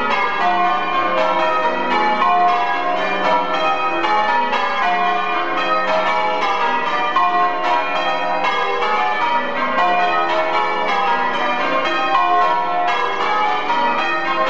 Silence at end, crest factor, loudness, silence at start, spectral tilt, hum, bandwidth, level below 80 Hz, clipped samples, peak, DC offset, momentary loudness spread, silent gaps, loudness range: 0 s; 16 dB; -17 LUFS; 0 s; -3.5 dB/octave; none; 7.8 kHz; -66 dBFS; under 0.1%; -2 dBFS; 4%; 3 LU; none; 1 LU